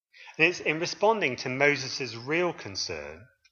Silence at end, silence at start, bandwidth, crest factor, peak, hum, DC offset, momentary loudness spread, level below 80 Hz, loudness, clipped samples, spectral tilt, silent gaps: 0.3 s; 0.2 s; 7.4 kHz; 22 dB; -8 dBFS; none; under 0.1%; 10 LU; -66 dBFS; -27 LUFS; under 0.1%; -3.5 dB/octave; none